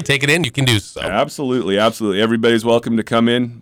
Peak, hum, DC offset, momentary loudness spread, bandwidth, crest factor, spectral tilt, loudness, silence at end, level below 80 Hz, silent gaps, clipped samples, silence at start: -4 dBFS; none; under 0.1%; 5 LU; 18 kHz; 12 dB; -5 dB/octave; -16 LUFS; 0.05 s; -48 dBFS; none; under 0.1%; 0 s